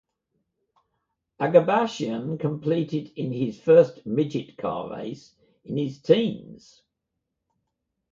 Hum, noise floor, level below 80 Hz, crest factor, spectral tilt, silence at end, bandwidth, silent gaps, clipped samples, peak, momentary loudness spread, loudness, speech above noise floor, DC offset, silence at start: none; -82 dBFS; -66 dBFS; 22 dB; -7.5 dB/octave; 1.55 s; 7.4 kHz; none; under 0.1%; -4 dBFS; 15 LU; -24 LUFS; 58 dB; under 0.1%; 1.4 s